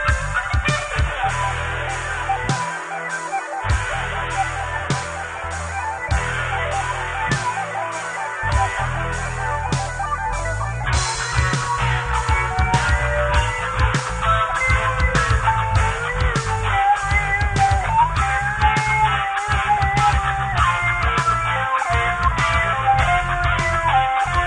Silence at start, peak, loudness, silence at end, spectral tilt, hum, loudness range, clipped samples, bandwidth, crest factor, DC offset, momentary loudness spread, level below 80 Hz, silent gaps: 0 s; -4 dBFS; -20 LUFS; 0 s; -4 dB/octave; none; 5 LU; under 0.1%; 10.5 kHz; 16 dB; under 0.1%; 7 LU; -28 dBFS; none